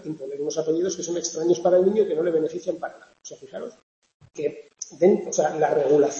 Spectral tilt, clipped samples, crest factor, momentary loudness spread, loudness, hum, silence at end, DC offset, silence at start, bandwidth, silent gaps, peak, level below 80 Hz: -5 dB/octave; under 0.1%; 16 dB; 19 LU; -23 LUFS; none; 0 s; under 0.1%; 0.05 s; 8 kHz; 3.83-4.02 s, 4.14-4.20 s; -6 dBFS; -70 dBFS